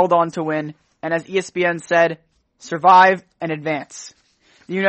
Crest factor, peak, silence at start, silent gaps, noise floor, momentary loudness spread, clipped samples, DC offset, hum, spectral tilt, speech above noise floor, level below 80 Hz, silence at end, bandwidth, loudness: 18 dB; 0 dBFS; 0 s; none; -56 dBFS; 20 LU; under 0.1%; under 0.1%; none; -5 dB/octave; 38 dB; -68 dBFS; 0 s; 8.8 kHz; -18 LUFS